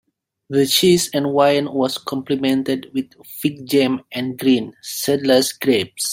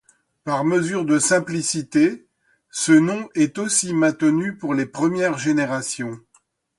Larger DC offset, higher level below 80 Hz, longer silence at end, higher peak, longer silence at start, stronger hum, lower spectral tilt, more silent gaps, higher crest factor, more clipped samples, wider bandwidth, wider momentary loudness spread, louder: neither; about the same, -60 dBFS vs -64 dBFS; second, 0 s vs 0.6 s; about the same, -2 dBFS vs -4 dBFS; about the same, 0.5 s vs 0.45 s; neither; about the same, -4 dB/octave vs -4.5 dB/octave; neither; about the same, 16 dB vs 16 dB; neither; first, 16.5 kHz vs 11.5 kHz; about the same, 10 LU vs 11 LU; about the same, -18 LUFS vs -20 LUFS